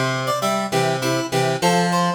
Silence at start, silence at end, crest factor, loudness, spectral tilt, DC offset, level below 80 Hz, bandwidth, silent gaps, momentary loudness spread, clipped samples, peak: 0 s; 0 s; 14 dB; -20 LUFS; -4.5 dB/octave; under 0.1%; -58 dBFS; over 20 kHz; none; 3 LU; under 0.1%; -6 dBFS